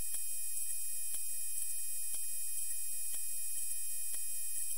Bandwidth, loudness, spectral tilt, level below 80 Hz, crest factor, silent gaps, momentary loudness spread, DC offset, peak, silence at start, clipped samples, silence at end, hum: 16 kHz; -37 LUFS; 1.5 dB/octave; -78 dBFS; 16 dB; none; 1 LU; 2%; -22 dBFS; 0 s; under 0.1%; 0 s; none